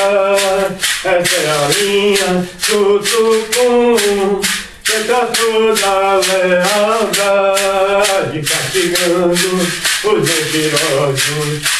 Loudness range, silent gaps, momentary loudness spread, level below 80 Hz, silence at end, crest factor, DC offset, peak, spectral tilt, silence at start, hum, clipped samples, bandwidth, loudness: 1 LU; none; 3 LU; -46 dBFS; 0 s; 14 dB; under 0.1%; 0 dBFS; -2.5 dB/octave; 0 s; none; under 0.1%; 12 kHz; -13 LUFS